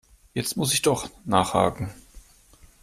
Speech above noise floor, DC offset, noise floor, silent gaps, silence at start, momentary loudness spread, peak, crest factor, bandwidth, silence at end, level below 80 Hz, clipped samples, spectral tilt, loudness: 30 dB; under 0.1%; -54 dBFS; none; 0.35 s; 13 LU; -4 dBFS; 22 dB; 15.5 kHz; 0.65 s; -50 dBFS; under 0.1%; -4 dB/octave; -24 LUFS